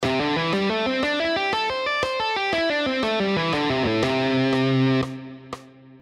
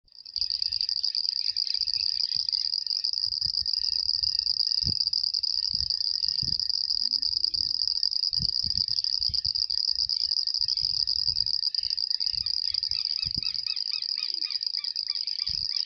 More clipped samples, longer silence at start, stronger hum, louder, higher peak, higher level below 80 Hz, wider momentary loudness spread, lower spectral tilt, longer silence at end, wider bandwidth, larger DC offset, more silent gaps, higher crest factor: neither; second, 0 s vs 0.15 s; neither; first, -22 LUFS vs -25 LUFS; about the same, -10 dBFS vs -8 dBFS; about the same, -52 dBFS vs -54 dBFS; first, 7 LU vs 4 LU; first, -5.5 dB/octave vs -0.5 dB/octave; about the same, 0.05 s vs 0 s; second, 11.5 kHz vs 13.5 kHz; neither; neither; second, 14 dB vs 20 dB